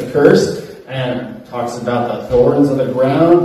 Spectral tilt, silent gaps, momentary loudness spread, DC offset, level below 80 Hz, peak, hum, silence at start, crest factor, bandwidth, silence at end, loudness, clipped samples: -7 dB/octave; none; 14 LU; under 0.1%; -42 dBFS; 0 dBFS; none; 0 s; 14 dB; 13.5 kHz; 0 s; -14 LUFS; 0.3%